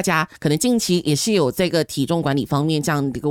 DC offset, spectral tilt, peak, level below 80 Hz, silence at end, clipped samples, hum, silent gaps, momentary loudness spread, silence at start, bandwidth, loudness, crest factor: under 0.1%; -5 dB/octave; -6 dBFS; -50 dBFS; 0 s; under 0.1%; none; none; 3 LU; 0 s; 18 kHz; -20 LUFS; 14 dB